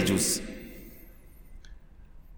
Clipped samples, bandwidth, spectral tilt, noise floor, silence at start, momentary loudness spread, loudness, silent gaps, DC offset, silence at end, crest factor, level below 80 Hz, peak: under 0.1%; over 20 kHz; -3.5 dB/octave; -49 dBFS; 0 s; 28 LU; -28 LUFS; none; under 0.1%; 0 s; 22 dB; -48 dBFS; -12 dBFS